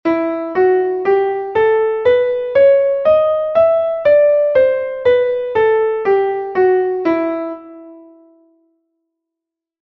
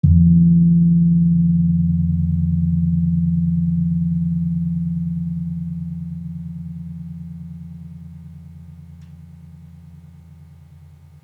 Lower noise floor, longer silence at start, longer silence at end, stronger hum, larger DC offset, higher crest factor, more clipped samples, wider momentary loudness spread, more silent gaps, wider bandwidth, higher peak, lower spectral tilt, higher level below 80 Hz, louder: first, -83 dBFS vs -44 dBFS; about the same, 0.05 s vs 0.05 s; first, 1.8 s vs 0.8 s; neither; neither; about the same, 12 dB vs 16 dB; neither; second, 7 LU vs 23 LU; neither; first, 5.8 kHz vs 0.8 kHz; about the same, -2 dBFS vs -2 dBFS; second, -7.5 dB/octave vs -13 dB/octave; second, -54 dBFS vs -40 dBFS; first, -14 LUFS vs -18 LUFS